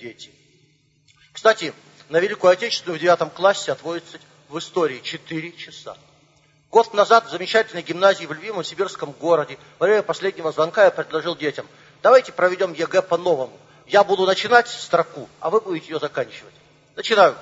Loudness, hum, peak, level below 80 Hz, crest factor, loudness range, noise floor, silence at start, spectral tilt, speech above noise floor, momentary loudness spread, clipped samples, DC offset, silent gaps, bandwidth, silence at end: -20 LUFS; none; 0 dBFS; -72 dBFS; 20 dB; 4 LU; -60 dBFS; 0 s; -4 dB/octave; 40 dB; 16 LU; under 0.1%; under 0.1%; none; 8 kHz; 0 s